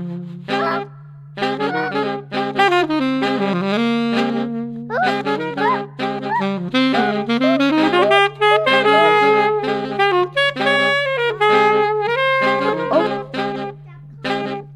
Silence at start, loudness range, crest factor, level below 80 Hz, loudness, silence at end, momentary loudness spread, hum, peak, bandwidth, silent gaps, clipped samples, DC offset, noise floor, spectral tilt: 0 s; 5 LU; 18 dB; -58 dBFS; -17 LUFS; 0 s; 11 LU; none; 0 dBFS; 12 kHz; none; under 0.1%; under 0.1%; -38 dBFS; -5.5 dB/octave